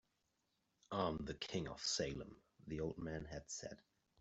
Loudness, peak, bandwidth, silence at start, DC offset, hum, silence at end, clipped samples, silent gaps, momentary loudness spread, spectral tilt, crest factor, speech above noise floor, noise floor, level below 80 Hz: -45 LUFS; -26 dBFS; 8.2 kHz; 0.9 s; under 0.1%; none; 0.45 s; under 0.1%; none; 14 LU; -4 dB/octave; 22 dB; 40 dB; -85 dBFS; -64 dBFS